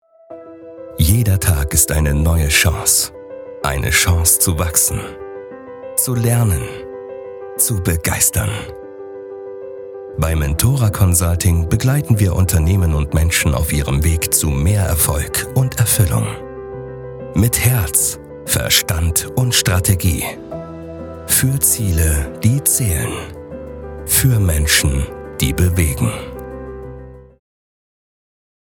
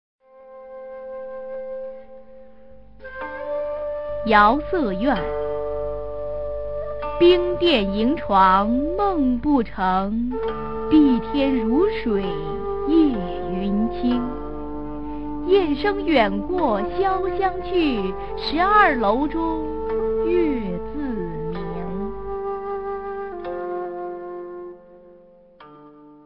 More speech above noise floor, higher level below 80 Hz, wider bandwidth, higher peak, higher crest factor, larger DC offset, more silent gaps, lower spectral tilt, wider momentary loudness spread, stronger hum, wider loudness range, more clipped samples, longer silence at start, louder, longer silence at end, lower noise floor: second, 22 dB vs 30 dB; first, -28 dBFS vs -40 dBFS; first, 18.5 kHz vs 5.6 kHz; about the same, 0 dBFS vs -2 dBFS; about the same, 16 dB vs 20 dB; second, under 0.1% vs 2%; neither; second, -4 dB/octave vs -8.5 dB/octave; about the same, 18 LU vs 16 LU; neither; second, 4 LU vs 11 LU; neither; first, 0.3 s vs 0.15 s; first, -15 LUFS vs -22 LUFS; first, 1.45 s vs 0 s; second, -37 dBFS vs -50 dBFS